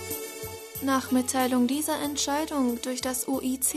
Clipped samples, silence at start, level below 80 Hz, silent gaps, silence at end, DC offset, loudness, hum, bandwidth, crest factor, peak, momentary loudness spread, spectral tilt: under 0.1%; 0 s; -58 dBFS; none; 0 s; under 0.1%; -27 LUFS; none; 13.5 kHz; 14 dB; -12 dBFS; 9 LU; -2.5 dB/octave